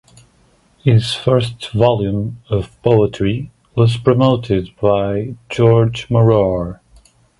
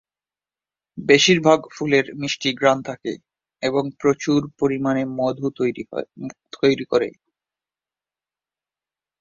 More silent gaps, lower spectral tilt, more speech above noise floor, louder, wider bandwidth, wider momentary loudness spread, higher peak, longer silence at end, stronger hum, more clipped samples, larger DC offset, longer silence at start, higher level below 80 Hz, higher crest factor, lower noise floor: neither; first, -7.5 dB/octave vs -4.5 dB/octave; second, 39 dB vs over 70 dB; first, -16 LUFS vs -20 LUFS; first, 11.5 kHz vs 7.6 kHz; second, 10 LU vs 15 LU; about the same, 0 dBFS vs -2 dBFS; second, 0.65 s vs 2.1 s; second, none vs 50 Hz at -55 dBFS; neither; neither; about the same, 0.85 s vs 0.95 s; first, -40 dBFS vs -62 dBFS; about the same, 16 dB vs 20 dB; second, -54 dBFS vs under -90 dBFS